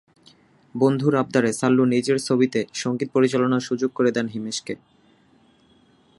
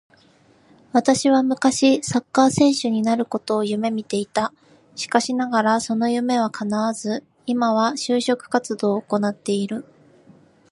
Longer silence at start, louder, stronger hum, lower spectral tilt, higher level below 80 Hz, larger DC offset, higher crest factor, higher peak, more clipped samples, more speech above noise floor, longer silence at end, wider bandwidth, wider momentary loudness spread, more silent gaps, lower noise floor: second, 0.75 s vs 0.95 s; about the same, -22 LUFS vs -21 LUFS; neither; about the same, -5.5 dB/octave vs -4.5 dB/octave; second, -68 dBFS vs -62 dBFS; neither; about the same, 18 dB vs 20 dB; about the same, -4 dBFS vs -2 dBFS; neither; about the same, 37 dB vs 35 dB; first, 1.45 s vs 0.9 s; about the same, 11.5 kHz vs 11.5 kHz; about the same, 10 LU vs 8 LU; neither; about the same, -58 dBFS vs -55 dBFS